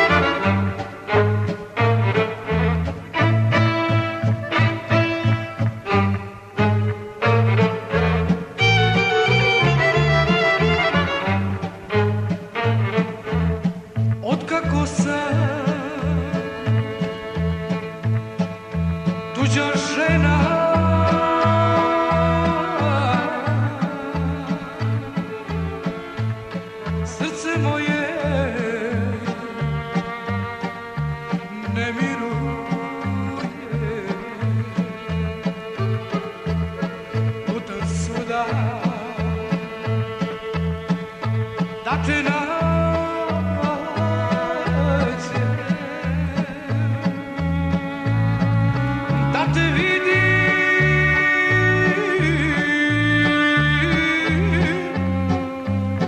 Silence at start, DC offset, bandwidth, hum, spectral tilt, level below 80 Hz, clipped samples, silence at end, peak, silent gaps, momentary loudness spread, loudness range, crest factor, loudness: 0 s; under 0.1%; 10 kHz; none; -6.5 dB/octave; -38 dBFS; under 0.1%; 0 s; -4 dBFS; none; 10 LU; 8 LU; 16 dB; -21 LUFS